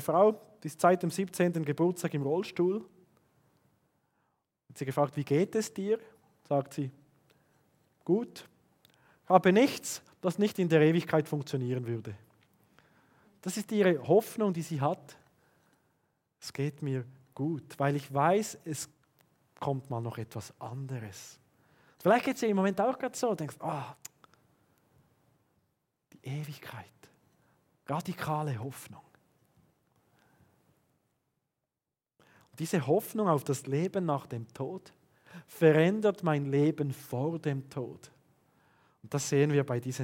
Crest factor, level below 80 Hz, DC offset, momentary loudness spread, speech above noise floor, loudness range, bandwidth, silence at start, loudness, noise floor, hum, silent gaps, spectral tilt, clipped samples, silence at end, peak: 26 dB; -80 dBFS; under 0.1%; 17 LU; over 60 dB; 11 LU; 17 kHz; 0 s; -31 LUFS; under -90 dBFS; none; none; -6 dB/octave; under 0.1%; 0 s; -6 dBFS